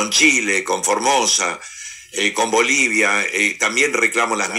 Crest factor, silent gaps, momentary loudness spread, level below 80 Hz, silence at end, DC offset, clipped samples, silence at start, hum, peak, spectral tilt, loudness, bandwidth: 16 dB; none; 9 LU; -62 dBFS; 0 s; under 0.1%; under 0.1%; 0 s; none; -2 dBFS; -0.5 dB/octave; -16 LUFS; 16 kHz